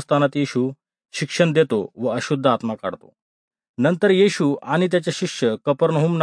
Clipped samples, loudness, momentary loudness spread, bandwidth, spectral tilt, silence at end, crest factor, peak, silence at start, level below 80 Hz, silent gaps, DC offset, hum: under 0.1%; -20 LUFS; 11 LU; 10.5 kHz; -6 dB/octave; 0 s; 18 dB; -2 dBFS; 0 s; -70 dBFS; 3.22-3.51 s, 3.69-3.74 s; under 0.1%; none